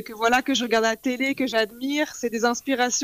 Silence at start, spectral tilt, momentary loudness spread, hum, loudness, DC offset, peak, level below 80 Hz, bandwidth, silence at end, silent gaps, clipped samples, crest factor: 0 s; -2 dB/octave; 4 LU; none; -23 LUFS; under 0.1%; -8 dBFS; -60 dBFS; 15.5 kHz; 0 s; none; under 0.1%; 16 dB